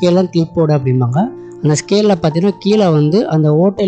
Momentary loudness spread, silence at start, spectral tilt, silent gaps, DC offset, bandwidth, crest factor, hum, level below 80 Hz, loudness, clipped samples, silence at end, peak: 5 LU; 0 s; -7 dB/octave; none; under 0.1%; 8.6 kHz; 10 dB; none; -50 dBFS; -13 LUFS; under 0.1%; 0 s; -2 dBFS